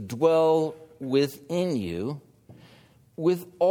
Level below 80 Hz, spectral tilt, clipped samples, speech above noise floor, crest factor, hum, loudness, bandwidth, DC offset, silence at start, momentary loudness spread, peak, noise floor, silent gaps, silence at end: -62 dBFS; -6.5 dB/octave; under 0.1%; 31 dB; 18 dB; none; -26 LUFS; 19 kHz; under 0.1%; 0 s; 15 LU; -10 dBFS; -56 dBFS; none; 0 s